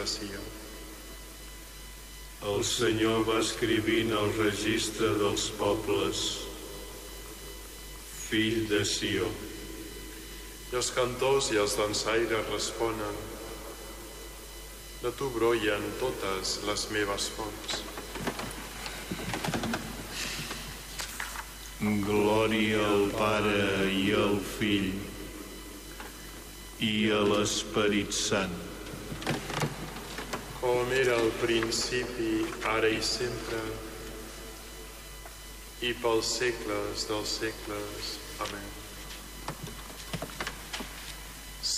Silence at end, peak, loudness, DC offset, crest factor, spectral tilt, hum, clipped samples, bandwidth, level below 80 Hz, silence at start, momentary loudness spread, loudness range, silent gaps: 0 s; -16 dBFS; -30 LUFS; under 0.1%; 16 dB; -3.5 dB/octave; none; under 0.1%; 15.5 kHz; -48 dBFS; 0 s; 17 LU; 7 LU; none